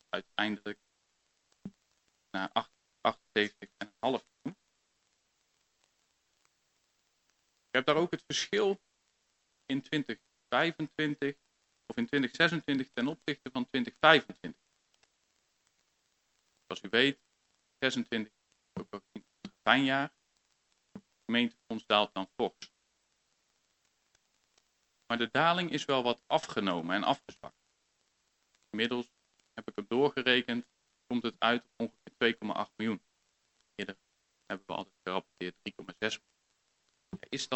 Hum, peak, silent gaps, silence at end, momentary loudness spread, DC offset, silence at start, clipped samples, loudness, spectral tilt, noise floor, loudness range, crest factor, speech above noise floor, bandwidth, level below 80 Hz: none; -4 dBFS; none; 0 s; 19 LU; under 0.1%; 0.15 s; under 0.1%; -32 LUFS; -4 dB/octave; -77 dBFS; 9 LU; 30 dB; 45 dB; 8.4 kHz; -76 dBFS